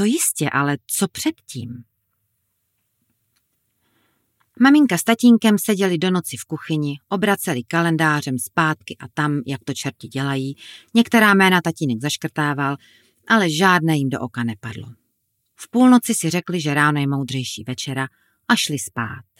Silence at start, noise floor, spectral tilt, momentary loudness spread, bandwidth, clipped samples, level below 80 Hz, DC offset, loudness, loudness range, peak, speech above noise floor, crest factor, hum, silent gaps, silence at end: 0 s; -71 dBFS; -4.5 dB/octave; 15 LU; 16.5 kHz; under 0.1%; -66 dBFS; under 0.1%; -19 LUFS; 5 LU; -2 dBFS; 52 dB; 18 dB; none; none; 0.2 s